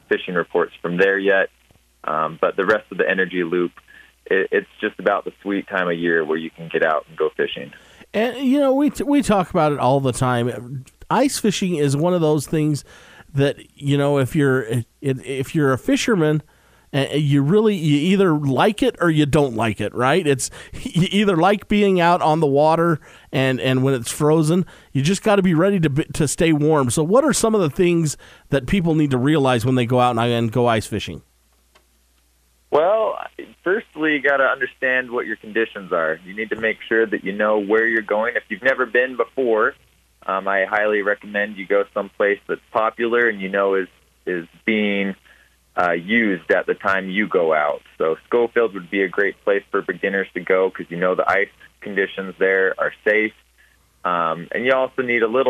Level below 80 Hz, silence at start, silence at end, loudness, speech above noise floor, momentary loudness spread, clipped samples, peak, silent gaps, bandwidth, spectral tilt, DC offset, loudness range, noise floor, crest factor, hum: -50 dBFS; 0.1 s; 0 s; -19 LUFS; 41 dB; 9 LU; under 0.1%; -2 dBFS; none; 15.5 kHz; -5.5 dB/octave; under 0.1%; 4 LU; -60 dBFS; 18 dB; none